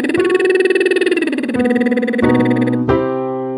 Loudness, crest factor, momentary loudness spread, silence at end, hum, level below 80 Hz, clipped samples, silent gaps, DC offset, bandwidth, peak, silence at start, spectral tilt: -15 LUFS; 14 dB; 4 LU; 0 s; none; -44 dBFS; under 0.1%; none; under 0.1%; 11.5 kHz; 0 dBFS; 0 s; -6.5 dB/octave